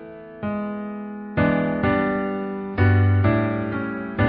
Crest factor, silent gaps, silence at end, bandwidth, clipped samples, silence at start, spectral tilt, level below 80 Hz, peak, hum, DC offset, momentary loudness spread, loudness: 16 dB; none; 0 s; 4.9 kHz; under 0.1%; 0 s; -12.5 dB/octave; -36 dBFS; -6 dBFS; none; under 0.1%; 13 LU; -22 LUFS